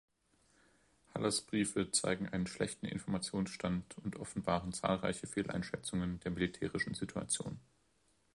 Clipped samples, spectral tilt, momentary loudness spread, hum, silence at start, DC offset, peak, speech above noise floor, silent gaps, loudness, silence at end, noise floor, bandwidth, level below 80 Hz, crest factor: under 0.1%; -4 dB/octave; 8 LU; none; 1.15 s; under 0.1%; -16 dBFS; 37 dB; none; -38 LUFS; 0.75 s; -75 dBFS; 11.5 kHz; -60 dBFS; 24 dB